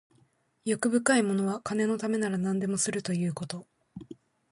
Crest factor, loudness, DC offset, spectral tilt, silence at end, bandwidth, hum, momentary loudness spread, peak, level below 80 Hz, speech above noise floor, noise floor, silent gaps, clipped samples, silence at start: 18 dB; -29 LUFS; under 0.1%; -5 dB/octave; 0.4 s; 11.5 kHz; none; 22 LU; -10 dBFS; -68 dBFS; 39 dB; -67 dBFS; none; under 0.1%; 0.65 s